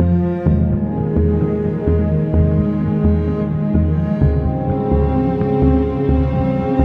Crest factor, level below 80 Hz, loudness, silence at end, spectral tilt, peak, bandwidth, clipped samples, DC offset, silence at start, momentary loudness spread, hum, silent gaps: 14 dB; -24 dBFS; -17 LUFS; 0 s; -11.5 dB/octave; -2 dBFS; 4.2 kHz; under 0.1%; under 0.1%; 0 s; 3 LU; none; none